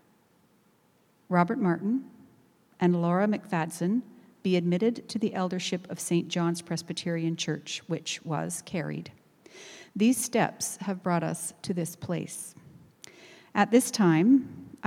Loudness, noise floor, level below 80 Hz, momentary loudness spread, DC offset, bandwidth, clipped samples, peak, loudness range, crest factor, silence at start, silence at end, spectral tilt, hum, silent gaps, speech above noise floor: -28 LUFS; -65 dBFS; -74 dBFS; 11 LU; under 0.1%; 16 kHz; under 0.1%; -8 dBFS; 4 LU; 22 dB; 1.3 s; 0 s; -5 dB/octave; none; none; 38 dB